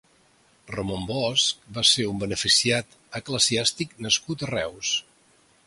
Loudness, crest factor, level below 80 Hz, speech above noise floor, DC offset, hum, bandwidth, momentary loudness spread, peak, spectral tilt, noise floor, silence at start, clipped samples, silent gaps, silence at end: -23 LUFS; 20 dB; -54 dBFS; 35 dB; under 0.1%; none; 11.5 kHz; 12 LU; -6 dBFS; -2 dB/octave; -61 dBFS; 0.7 s; under 0.1%; none; 0.65 s